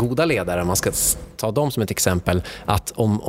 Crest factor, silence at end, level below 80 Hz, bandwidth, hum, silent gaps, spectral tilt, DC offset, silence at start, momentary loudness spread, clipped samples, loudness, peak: 20 dB; 0 s; -38 dBFS; 16.5 kHz; none; none; -4.5 dB/octave; under 0.1%; 0 s; 5 LU; under 0.1%; -21 LUFS; 0 dBFS